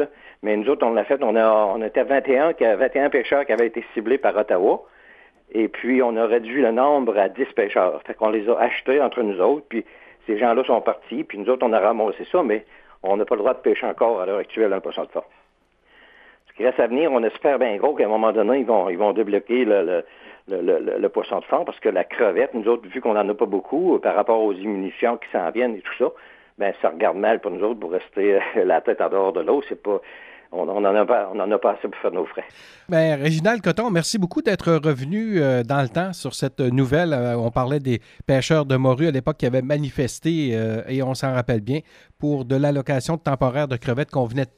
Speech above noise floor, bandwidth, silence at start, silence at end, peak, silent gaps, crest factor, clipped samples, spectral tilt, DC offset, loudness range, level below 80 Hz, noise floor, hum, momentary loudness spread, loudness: 41 dB; 13.5 kHz; 0 s; 0.1 s; -4 dBFS; none; 18 dB; under 0.1%; -6.5 dB/octave; under 0.1%; 3 LU; -54 dBFS; -61 dBFS; none; 7 LU; -21 LUFS